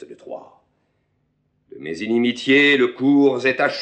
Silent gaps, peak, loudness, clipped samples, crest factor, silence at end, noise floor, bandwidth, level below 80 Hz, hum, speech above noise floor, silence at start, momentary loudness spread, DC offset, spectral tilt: none; -4 dBFS; -17 LUFS; under 0.1%; 16 dB; 0 s; -68 dBFS; 8.8 kHz; -70 dBFS; none; 49 dB; 0 s; 22 LU; under 0.1%; -5 dB/octave